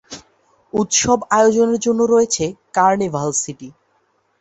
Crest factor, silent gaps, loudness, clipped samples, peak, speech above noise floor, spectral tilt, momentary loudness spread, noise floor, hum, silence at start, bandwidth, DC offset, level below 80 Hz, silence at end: 16 dB; none; -16 LUFS; under 0.1%; -2 dBFS; 46 dB; -3.5 dB/octave; 13 LU; -63 dBFS; none; 0.1 s; 8.2 kHz; under 0.1%; -52 dBFS; 0.7 s